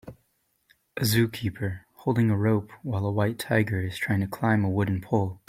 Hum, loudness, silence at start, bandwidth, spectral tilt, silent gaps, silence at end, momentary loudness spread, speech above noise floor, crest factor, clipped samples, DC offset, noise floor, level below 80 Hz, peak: none; -26 LUFS; 0.05 s; 16 kHz; -6.5 dB/octave; none; 0.1 s; 8 LU; 46 dB; 18 dB; under 0.1%; under 0.1%; -71 dBFS; -58 dBFS; -8 dBFS